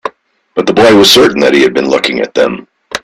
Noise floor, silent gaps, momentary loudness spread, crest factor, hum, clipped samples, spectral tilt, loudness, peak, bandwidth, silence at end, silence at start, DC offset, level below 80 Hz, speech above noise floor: -40 dBFS; none; 17 LU; 10 dB; none; 0.3%; -3.5 dB/octave; -8 LUFS; 0 dBFS; 17 kHz; 0.05 s; 0.05 s; under 0.1%; -46 dBFS; 33 dB